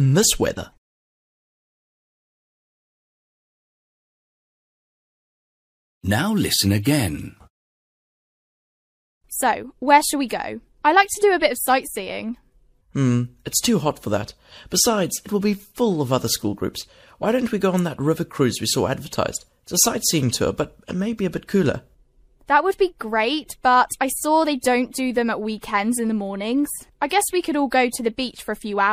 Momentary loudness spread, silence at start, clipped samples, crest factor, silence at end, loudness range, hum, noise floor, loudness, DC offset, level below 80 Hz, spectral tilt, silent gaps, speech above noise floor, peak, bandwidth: 11 LU; 0 s; under 0.1%; 20 dB; 0 s; 4 LU; none; -56 dBFS; -21 LUFS; under 0.1%; -50 dBFS; -4 dB/octave; 0.78-6.01 s, 7.50-9.21 s; 35 dB; -2 dBFS; 15.5 kHz